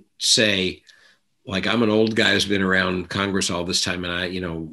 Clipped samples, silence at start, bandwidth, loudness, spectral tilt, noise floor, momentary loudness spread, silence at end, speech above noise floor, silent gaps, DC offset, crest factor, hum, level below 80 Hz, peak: under 0.1%; 0.2 s; 13 kHz; -20 LUFS; -3 dB/octave; -58 dBFS; 10 LU; 0 s; 36 dB; none; under 0.1%; 20 dB; none; -54 dBFS; -2 dBFS